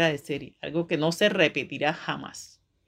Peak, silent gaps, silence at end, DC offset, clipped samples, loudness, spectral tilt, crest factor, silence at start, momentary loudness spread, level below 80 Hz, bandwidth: -6 dBFS; none; 0.4 s; under 0.1%; under 0.1%; -26 LUFS; -4.5 dB/octave; 22 dB; 0 s; 13 LU; -66 dBFS; 16 kHz